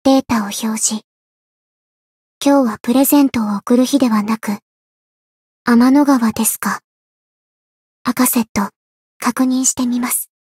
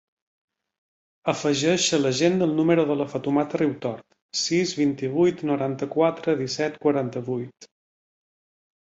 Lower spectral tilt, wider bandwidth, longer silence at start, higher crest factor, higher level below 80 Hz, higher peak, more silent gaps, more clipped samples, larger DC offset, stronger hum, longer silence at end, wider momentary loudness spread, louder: about the same, -3.5 dB/octave vs -4.5 dB/octave; first, 16.5 kHz vs 8.2 kHz; second, 0.05 s vs 1.25 s; about the same, 16 dB vs 18 dB; first, -56 dBFS vs -66 dBFS; first, 0 dBFS vs -6 dBFS; first, 1.04-2.41 s, 4.62-5.65 s, 6.84-8.05 s, 8.49-8.55 s, 8.76-9.20 s vs 4.22-4.29 s; neither; neither; neither; second, 0.15 s vs 1.2 s; about the same, 10 LU vs 10 LU; first, -15 LUFS vs -24 LUFS